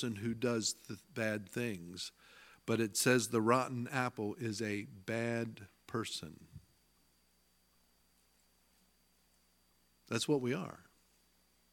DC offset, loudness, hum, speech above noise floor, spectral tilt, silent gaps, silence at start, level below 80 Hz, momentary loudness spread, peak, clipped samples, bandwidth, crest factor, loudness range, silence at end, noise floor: under 0.1%; -37 LUFS; 60 Hz at -65 dBFS; 37 dB; -4.5 dB/octave; none; 0 s; -76 dBFS; 15 LU; -14 dBFS; under 0.1%; 17.5 kHz; 24 dB; 13 LU; 0.9 s; -73 dBFS